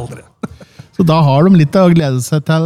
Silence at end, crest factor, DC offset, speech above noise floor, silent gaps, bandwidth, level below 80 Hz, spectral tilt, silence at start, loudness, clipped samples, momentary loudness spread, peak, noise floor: 0 s; 10 dB; under 0.1%; 28 dB; none; 14 kHz; -46 dBFS; -7.5 dB/octave; 0 s; -11 LUFS; under 0.1%; 20 LU; -2 dBFS; -37 dBFS